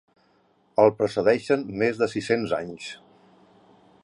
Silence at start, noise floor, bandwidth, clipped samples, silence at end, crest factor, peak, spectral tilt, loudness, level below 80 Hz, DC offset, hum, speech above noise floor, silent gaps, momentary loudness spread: 0.8 s; -63 dBFS; 11 kHz; under 0.1%; 1.05 s; 22 dB; -4 dBFS; -6 dB/octave; -24 LUFS; -62 dBFS; under 0.1%; none; 40 dB; none; 16 LU